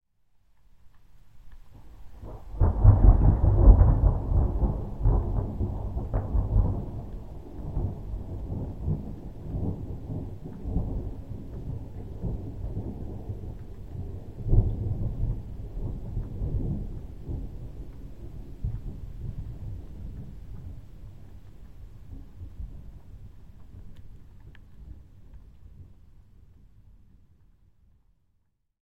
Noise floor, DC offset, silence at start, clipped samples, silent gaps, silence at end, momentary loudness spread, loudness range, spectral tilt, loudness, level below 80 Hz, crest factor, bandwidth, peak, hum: -73 dBFS; 0.5%; 0 s; under 0.1%; none; 0 s; 26 LU; 24 LU; -11 dB/octave; -29 LUFS; -30 dBFS; 26 dB; 2 kHz; -2 dBFS; none